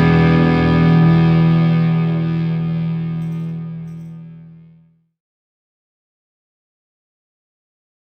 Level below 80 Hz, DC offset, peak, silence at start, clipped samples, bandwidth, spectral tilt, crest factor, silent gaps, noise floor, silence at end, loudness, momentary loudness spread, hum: -40 dBFS; under 0.1%; -2 dBFS; 0 s; under 0.1%; 5.4 kHz; -9.5 dB/octave; 14 dB; none; -51 dBFS; 3.6 s; -15 LUFS; 18 LU; none